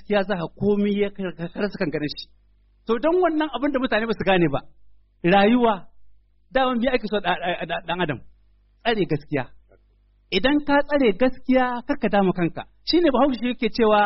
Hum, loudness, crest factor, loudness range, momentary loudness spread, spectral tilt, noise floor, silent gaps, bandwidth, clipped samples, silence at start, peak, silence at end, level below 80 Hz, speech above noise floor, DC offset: 50 Hz at -50 dBFS; -22 LUFS; 16 dB; 5 LU; 10 LU; -4 dB/octave; -59 dBFS; none; 5.8 kHz; under 0.1%; 0 s; -6 dBFS; 0 s; -44 dBFS; 38 dB; under 0.1%